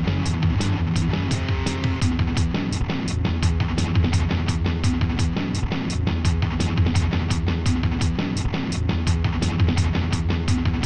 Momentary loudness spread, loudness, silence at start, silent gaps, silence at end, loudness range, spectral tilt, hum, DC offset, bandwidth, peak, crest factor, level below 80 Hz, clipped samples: 4 LU; -23 LUFS; 0 s; none; 0 s; 0 LU; -6 dB/octave; none; 0.5%; 10 kHz; -8 dBFS; 12 dB; -30 dBFS; under 0.1%